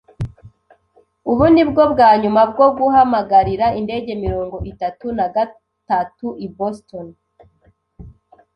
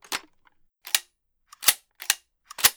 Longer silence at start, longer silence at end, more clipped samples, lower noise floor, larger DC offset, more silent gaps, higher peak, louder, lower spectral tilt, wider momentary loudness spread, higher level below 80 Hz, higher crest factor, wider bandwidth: about the same, 0.2 s vs 0.1 s; first, 0.45 s vs 0.05 s; neither; second, -58 dBFS vs -65 dBFS; neither; neither; about the same, -2 dBFS vs -2 dBFS; first, -16 LUFS vs -25 LUFS; first, -8.5 dB/octave vs 2.5 dB/octave; about the same, 17 LU vs 15 LU; first, -40 dBFS vs -66 dBFS; second, 16 dB vs 28 dB; second, 8.6 kHz vs over 20 kHz